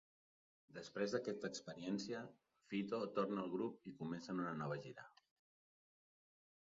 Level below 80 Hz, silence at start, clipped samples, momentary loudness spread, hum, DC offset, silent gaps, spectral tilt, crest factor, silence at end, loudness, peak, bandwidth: -84 dBFS; 0.7 s; under 0.1%; 14 LU; none; under 0.1%; none; -5 dB/octave; 22 dB; 1.65 s; -45 LUFS; -26 dBFS; 7.4 kHz